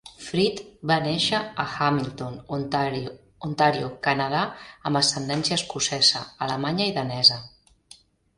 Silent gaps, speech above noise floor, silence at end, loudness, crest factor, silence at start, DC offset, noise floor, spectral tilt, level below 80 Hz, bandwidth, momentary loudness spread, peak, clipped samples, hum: none; 29 dB; 0.9 s; -23 LUFS; 22 dB; 0.05 s; under 0.1%; -54 dBFS; -3.5 dB/octave; -58 dBFS; 11.5 kHz; 14 LU; -4 dBFS; under 0.1%; none